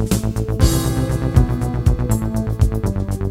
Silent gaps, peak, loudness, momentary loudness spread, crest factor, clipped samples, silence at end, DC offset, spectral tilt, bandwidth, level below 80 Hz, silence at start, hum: none; 0 dBFS; -19 LUFS; 5 LU; 18 dB; under 0.1%; 0 s; under 0.1%; -6.5 dB/octave; 16.5 kHz; -22 dBFS; 0 s; none